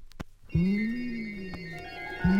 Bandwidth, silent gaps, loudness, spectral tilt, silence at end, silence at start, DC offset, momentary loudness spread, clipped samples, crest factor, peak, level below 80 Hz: 7.8 kHz; none; -32 LUFS; -8 dB/octave; 0 s; 0 s; under 0.1%; 13 LU; under 0.1%; 16 dB; -14 dBFS; -44 dBFS